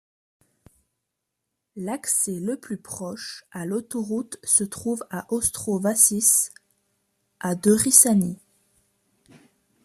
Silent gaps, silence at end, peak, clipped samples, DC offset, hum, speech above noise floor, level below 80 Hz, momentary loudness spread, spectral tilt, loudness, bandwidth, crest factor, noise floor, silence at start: none; 1.5 s; 0 dBFS; under 0.1%; under 0.1%; none; 58 dB; -62 dBFS; 19 LU; -3.5 dB/octave; -21 LUFS; 15 kHz; 26 dB; -81 dBFS; 1.75 s